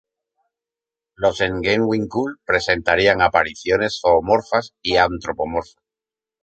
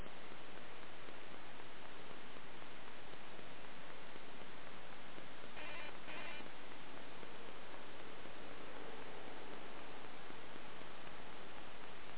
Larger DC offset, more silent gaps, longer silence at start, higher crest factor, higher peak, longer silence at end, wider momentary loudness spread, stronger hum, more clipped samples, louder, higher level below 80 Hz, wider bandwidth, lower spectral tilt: second, under 0.1% vs 1%; neither; first, 1.2 s vs 0 s; about the same, 20 dB vs 18 dB; first, 0 dBFS vs -30 dBFS; first, 0.8 s vs 0 s; first, 8 LU vs 5 LU; neither; neither; first, -19 LUFS vs -53 LUFS; first, -44 dBFS vs -74 dBFS; first, 8.8 kHz vs 4 kHz; first, -5 dB/octave vs -2.5 dB/octave